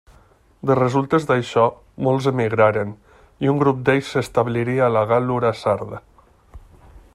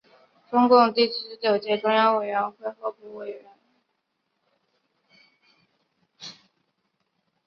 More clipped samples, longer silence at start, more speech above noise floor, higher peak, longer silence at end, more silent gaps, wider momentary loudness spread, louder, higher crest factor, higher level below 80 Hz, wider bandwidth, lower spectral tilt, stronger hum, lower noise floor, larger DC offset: neither; first, 0.65 s vs 0.5 s; second, 34 dB vs 54 dB; about the same, -2 dBFS vs -4 dBFS; second, 0.15 s vs 1.15 s; neither; second, 8 LU vs 24 LU; about the same, -20 LUFS vs -22 LUFS; about the same, 18 dB vs 22 dB; first, -52 dBFS vs -76 dBFS; first, 12.5 kHz vs 6.6 kHz; first, -7 dB/octave vs -5.5 dB/octave; neither; second, -53 dBFS vs -77 dBFS; neither